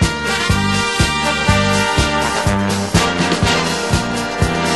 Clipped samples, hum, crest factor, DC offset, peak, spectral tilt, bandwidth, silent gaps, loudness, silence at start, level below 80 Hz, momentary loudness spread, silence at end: under 0.1%; none; 16 dB; 0.4%; 0 dBFS; -4 dB/octave; 12.5 kHz; none; -15 LUFS; 0 s; -28 dBFS; 3 LU; 0 s